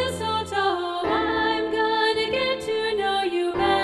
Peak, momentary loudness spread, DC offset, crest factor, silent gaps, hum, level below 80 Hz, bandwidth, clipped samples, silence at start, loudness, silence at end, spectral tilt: -10 dBFS; 4 LU; under 0.1%; 14 dB; none; none; -50 dBFS; 13 kHz; under 0.1%; 0 s; -23 LUFS; 0 s; -4 dB/octave